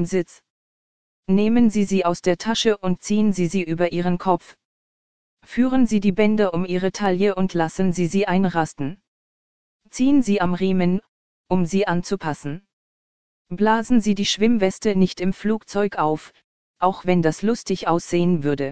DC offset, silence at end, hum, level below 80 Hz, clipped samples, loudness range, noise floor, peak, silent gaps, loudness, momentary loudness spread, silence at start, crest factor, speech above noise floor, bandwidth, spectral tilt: 2%; 0 s; none; -48 dBFS; under 0.1%; 3 LU; under -90 dBFS; -4 dBFS; 0.50-1.23 s, 4.65-5.37 s, 9.08-9.80 s, 11.08-11.44 s, 12.73-13.45 s, 16.44-16.74 s; -21 LUFS; 8 LU; 0 s; 16 dB; over 70 dB; 9.4 kHz; -6 dB/octave